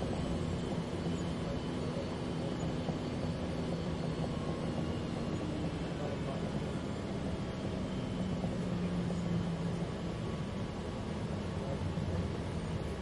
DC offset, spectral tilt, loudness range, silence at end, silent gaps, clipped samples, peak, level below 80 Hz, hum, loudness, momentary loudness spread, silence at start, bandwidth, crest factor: under 0.1%; -7 dB/octave; 1 LU; 0 s; none; under 0.1%; -22 dBFS; -50 dBFS; none; -37 LUFS; 3 LU; 0 s; 11.5 kHz; 14 dB